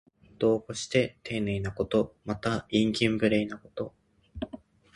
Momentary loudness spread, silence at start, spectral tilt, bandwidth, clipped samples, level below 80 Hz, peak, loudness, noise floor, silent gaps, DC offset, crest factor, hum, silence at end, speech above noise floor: 14 LU; 0.4 s; -5.5 dB/octave; 11.5 kHz; under 0.1%; -54 dBFS; -10 dBFS; -29 LUFS; -48 dBFS; none; under 0.1%; 20 dB; none; 0.4 s; 20 dB